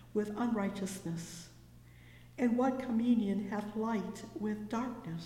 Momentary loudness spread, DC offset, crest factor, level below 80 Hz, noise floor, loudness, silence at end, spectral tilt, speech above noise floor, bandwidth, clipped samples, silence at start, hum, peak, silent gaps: 12 LU; under 0.1%; 16 dB; -64 dBFS; -56 dBFS; -35 LUFS; 0 s; -6.5 dB/octave; 22 dB; 15.5 kHz; under 0.1%; 0 s; 60 Hz at -55 dBFS; -20 dBFS; none